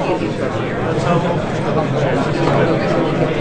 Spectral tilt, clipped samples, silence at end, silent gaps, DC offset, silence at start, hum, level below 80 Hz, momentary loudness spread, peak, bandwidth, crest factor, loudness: -7 dB/octave; under 0.1%; 0 s; none; 0.5%; 0 s; none; -38 dBFS; 5 LU; -2 dBFS; 9.4 kHz; 14 dB; -17 LUFS